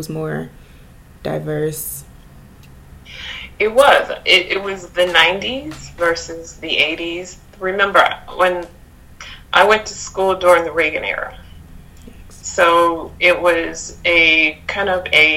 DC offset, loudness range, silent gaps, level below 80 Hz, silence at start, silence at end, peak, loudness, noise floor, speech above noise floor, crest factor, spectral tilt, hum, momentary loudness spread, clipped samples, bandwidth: under 0.1%; 4 LU; none; -44 dBFS; 0 s; 0 s; 0 dBFS; -15 LUFS; -42 dBFS; 26 dB; 18 dB; -3 dB/octave; none; 18 LU; under 0.1%; 16.5 kHz